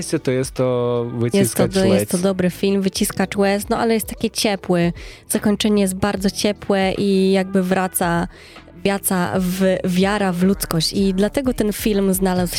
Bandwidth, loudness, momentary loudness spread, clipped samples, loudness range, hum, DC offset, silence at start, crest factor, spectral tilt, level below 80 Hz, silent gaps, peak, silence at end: 16.5 kHz; -19 LUFS; 4 LU; under 0.1%; 1 LU; none; under 0.1%; 0 s; 18 dB; -5 dB/octave; -40 dBFS; none; -2 dBFS; 0 s